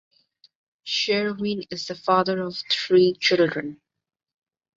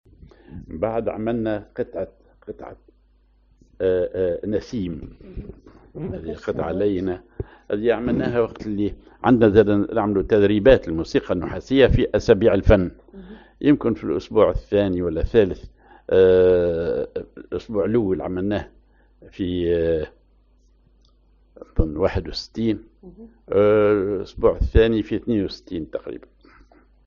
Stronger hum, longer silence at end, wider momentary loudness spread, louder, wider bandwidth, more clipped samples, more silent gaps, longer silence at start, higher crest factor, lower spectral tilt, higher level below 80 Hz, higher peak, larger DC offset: neither; about the same, 1 s vs 0.9 s; second, 13 LU vs 18 LU; about the same, -22 LUFS vs -21 LUFS; about the same, 7.6 kHz vs 7 kHz; neither; neither; first, 0.85 s vs 0.55 s; about the same, 18 dB vs 20 dB; second, -4.5 dB/octave vs -6.5 dB/octave; second, -66 dBFS vs -34 dBFS; second, -6 dBFS vs 0 dBFS; neither